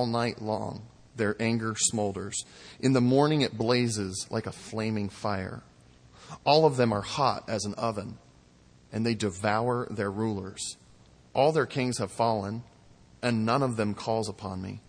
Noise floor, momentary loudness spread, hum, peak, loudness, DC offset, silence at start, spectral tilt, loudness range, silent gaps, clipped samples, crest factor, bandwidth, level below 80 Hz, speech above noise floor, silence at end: -58 dBFS; 13 LU; none; -6 dBFS; -28 LUFS; under 0.1%; 0 s; -5 dB/octave; 4 LU; none; under 0.1%; 22 dB; 10.5 kHz; -62 dBFS; 30 dB; 0.1 s